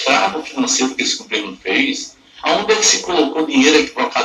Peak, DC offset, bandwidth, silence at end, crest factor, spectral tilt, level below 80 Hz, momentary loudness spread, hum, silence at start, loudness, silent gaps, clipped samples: 0 dBFS; under 0.1%; 14 kHz; 0 s; 16 dB; -1 dB/octave; -56 dBFS; 9 LU; none; 0 s; -15 LUFS; none; under 0.1%